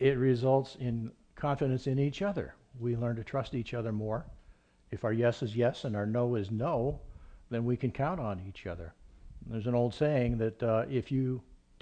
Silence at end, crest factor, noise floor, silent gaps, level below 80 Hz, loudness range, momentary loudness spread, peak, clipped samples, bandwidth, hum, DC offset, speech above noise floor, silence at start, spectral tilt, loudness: 0.25 s; 18 dB; -60 dBFS; none; -52 dBFS; 3 LU; 12 LU; -14 dBFS; under 0.1%; 8.6 kHz; none; under 0.1%; 29 dB; 0 s; -8.5 dB/octave; -33 LUFS